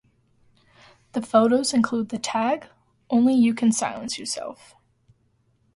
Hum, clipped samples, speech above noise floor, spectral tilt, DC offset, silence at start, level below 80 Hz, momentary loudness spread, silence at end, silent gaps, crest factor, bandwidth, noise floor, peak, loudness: none; under 0.1%; 44 dB; -4 dB/octave; under 0.1%; 1.15 s; -66 dBFS; 12 LU; 1.2 s; none; 20 dB; 11.5 kHz; -66 dBFS; -4 dBFS; -23 LUFS